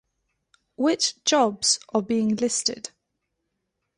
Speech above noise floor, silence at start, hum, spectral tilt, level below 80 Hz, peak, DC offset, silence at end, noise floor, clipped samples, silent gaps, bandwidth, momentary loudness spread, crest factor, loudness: 55 dB; 0.8 s; none; -2.5 dB/octave; -68 dBFS; -8 dBFS; under 0.1%; 1.1 s; -79 dBFS; under 0.1%; none; 11.5 kHz; 6 LU; 18 dB; -23 LUFS